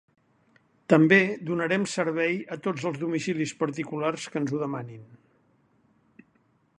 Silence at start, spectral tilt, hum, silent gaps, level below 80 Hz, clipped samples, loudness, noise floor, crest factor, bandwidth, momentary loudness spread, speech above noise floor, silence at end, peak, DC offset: 0.9 s; -6 dB/octave; none; none; -72 dBFS; under 0.1%; -26 LUFS; -66 dBFS; 24 dB; 11 kHz; 12 LU; 41 dB; 1.65 s; -4 dBFS; under 0.1%